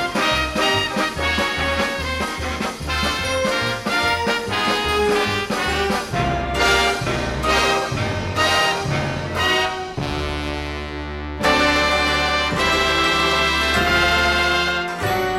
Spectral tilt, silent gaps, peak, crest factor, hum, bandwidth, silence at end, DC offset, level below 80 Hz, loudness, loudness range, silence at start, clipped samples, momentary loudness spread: -3.5 dB/octave; none; -4 dBFS; 16 dB; none; 16.5 kHz; 0 s; under 0.1%; -34 dBFS; -19 LUFS; 4 LU; 0 s; under 0.1%; 8 LU